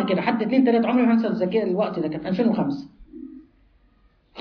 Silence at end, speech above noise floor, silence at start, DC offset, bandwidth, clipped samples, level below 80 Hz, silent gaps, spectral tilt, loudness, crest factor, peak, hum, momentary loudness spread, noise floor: 0 s; 38 dB; 0 s; under 0.1%; 5.4 kHz; under 0.1%; -58 dBFS; none; -9 dB/octave; -22 LUFS; 16 dB; -6 dBFS; none; 22 LU; -59 dBFS